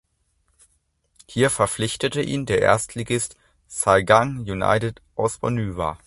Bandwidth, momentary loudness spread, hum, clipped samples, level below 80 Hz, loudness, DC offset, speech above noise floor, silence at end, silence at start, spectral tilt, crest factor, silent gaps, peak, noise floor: 12 kHz; 9 LU; none; under 0.1%; -46 dBFS; -22 LUFS; under 0.1%; 46 dB; 0.1 s; 1.3 s; -4.5 dB/octave; 22 dB; none; 0 dBFS; -68 dBFS